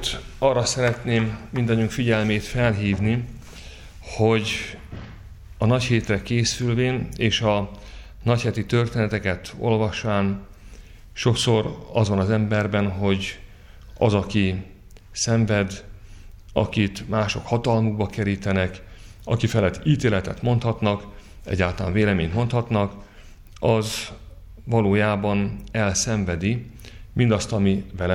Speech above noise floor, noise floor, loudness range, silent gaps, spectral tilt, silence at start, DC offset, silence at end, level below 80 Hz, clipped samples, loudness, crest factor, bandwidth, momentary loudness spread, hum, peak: 22 dB; -44 dBFS; 2 LU; none; -5.5 dB/octave; 0 s; under 0.1%; 0 s; -42 dBFS; under 0.1%; -23 LUFS; 18 dB; 14 kHz; 14 LU; none; -6 dBFS